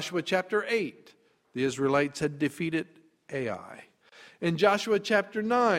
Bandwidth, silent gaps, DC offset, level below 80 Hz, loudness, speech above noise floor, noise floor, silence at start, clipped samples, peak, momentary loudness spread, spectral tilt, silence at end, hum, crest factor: 15.5 kHz; none; under 0.1%; -68 dBFS; -28 LUFS; 27 dB; -55 dBFS; 0 s; under 0.1%; -8 dBFS; 13 LU; -5 dB/octave; 0 s; none; 22 dB